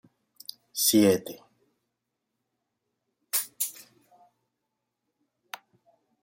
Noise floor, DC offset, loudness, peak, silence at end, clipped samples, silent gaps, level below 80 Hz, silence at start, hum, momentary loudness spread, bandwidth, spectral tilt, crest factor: -83 dBFS; under 0.1%; -25 LUFS; -8 dBFS; 2.5 s; under 0.1%; none; -76 dBFS; 0.75 s; 60 Hz at -80 dBFS; 24 LU; 16.5 kHz; -3.5 dB/octave; 24 dB